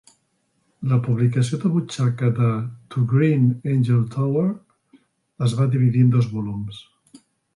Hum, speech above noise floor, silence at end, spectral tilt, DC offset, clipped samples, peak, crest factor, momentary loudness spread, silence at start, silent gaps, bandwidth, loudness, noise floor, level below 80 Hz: none; 49 dB; 0.75 s; -8 dB/octave; under 0.1%; under 0.1%; -6 dBFS; 14 dB; 12 LU; 0.8 s; none; 11 kHz; -21 LUFS; -68 dBFS; -56 dBFS